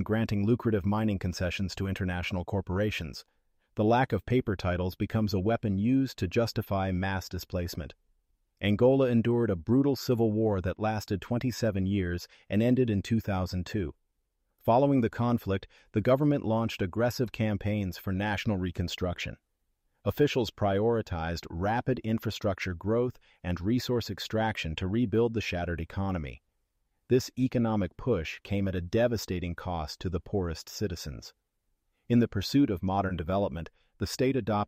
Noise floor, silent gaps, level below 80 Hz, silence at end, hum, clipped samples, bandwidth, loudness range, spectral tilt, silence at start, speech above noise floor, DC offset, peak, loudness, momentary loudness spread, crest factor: -78 dBFS; none; -50 dBFS; 0 s; none; under 0.1%; 15.5 kHz; 4 LU; -7 dB/octave; 0 s; 49 dB; under 0.1%; -12 dBFS; -30 LUFS; 9 LU; 16 dB